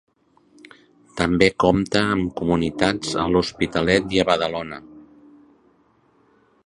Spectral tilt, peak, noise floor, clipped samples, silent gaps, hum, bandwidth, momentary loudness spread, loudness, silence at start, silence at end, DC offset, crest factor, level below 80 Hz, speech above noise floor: -5.5 dB/octave; 0 dBFS; -60 dBFS; under 0.1%; none; none; 11 kHz; 9 LU; -20 LUFS; 1.15 s; 1.65 s; under 0.1%; 22 dB; -44 dBFS; 40 dB